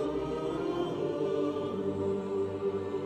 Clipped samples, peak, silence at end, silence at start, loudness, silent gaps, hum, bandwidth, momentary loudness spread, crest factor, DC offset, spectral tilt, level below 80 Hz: under 0.1%; -20 dBFS; 0 s; 0 s; -33 LUFS; none; none; 9 kHz; 2 LU; 12 dB; under 0.1%; -7.5 dB/octave; -58 dBFS